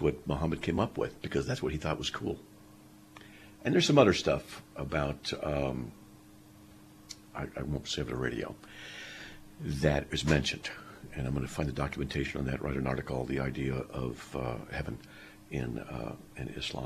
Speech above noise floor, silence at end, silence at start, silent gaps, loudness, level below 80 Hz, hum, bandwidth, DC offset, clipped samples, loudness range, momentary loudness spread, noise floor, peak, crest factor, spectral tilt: 22 dB; 0 s; 0 s; none; -33 LUFS; -48 dBFS; none; 14 kHz; under 0.1%; under 0.1%; 8 LU; 16 LU; -55 dBFS; -8 dBFS; 26 dB; -5.5 dB/octave